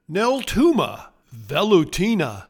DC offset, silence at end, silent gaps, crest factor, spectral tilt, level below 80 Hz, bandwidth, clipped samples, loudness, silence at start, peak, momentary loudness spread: under 0.1%; 0.05 s; none; 16 dB; -5.5 dB/octave; -42 dBFS; 19 kHz; under 0.1%; -20 LUFS; 0.1 s; -4 dBFS; 8 LU